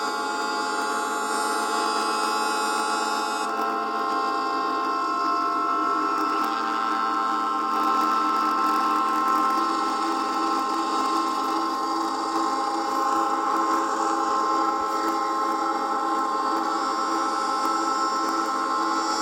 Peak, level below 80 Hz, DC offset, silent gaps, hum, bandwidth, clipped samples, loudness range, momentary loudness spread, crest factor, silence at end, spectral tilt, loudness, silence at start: -10 dBFS; -68 dBFS; under 0.1%; none; none; 17 kHz; under 0.1%; 2 LU; 4 LU; 14 dB; 0 s; -1.5 dB/octave; -24 LUFS; 0 s